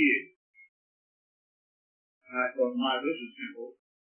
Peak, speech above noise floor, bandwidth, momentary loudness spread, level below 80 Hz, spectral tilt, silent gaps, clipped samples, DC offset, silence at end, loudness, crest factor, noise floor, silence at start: -10 dBFS; over 57 dB; 3.4 kHz; 18 LU; under -90 dBFS; -7 dB/octave; 0.36-0.54 s, 0.69-2.21 s; under 0.1%; under 0.1%; 0.4 s; -31 LUFS; 22 dB; under -90 dBFS; 0 s